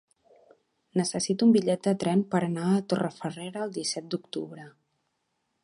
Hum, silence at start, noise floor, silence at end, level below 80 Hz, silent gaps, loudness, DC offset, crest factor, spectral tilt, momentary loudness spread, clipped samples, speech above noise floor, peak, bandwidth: none; 0.95 s; -78 dBFS; 0.95 s; -72 dBFS; none; -27 LUFS; under 0.1%; 18 dB; -5.5 dB/octave; 14 LU; under 0.1%; 51 dB; -10 dBFS; 11.5 kHz